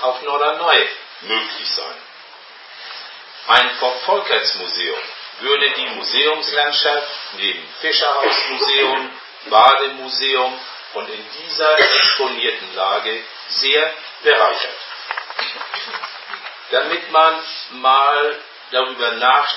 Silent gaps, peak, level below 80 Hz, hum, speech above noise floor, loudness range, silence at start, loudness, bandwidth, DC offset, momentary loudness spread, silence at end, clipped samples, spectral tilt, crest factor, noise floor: none; 0 dBFS; -68 dBFS; none; 23 dB; 4 LU; 0 s; -16 LUFS; 8 kHz; under 0.1%; 16 LU; 0 s; under 0.1%; -2.5 dB/octave; 18 dB; -40 dBFS